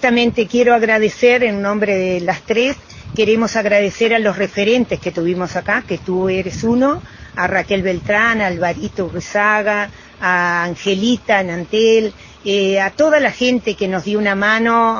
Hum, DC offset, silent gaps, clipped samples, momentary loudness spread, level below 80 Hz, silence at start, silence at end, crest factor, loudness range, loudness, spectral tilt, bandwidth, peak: none; under 0.1%; none; under 0.1%; 7 LU; -44 dBFS; 0 s; 0 s; 16 dB; 2 LU; -16 LUFS; -5 dB/octave; 7.2 kHz; 0 dBFS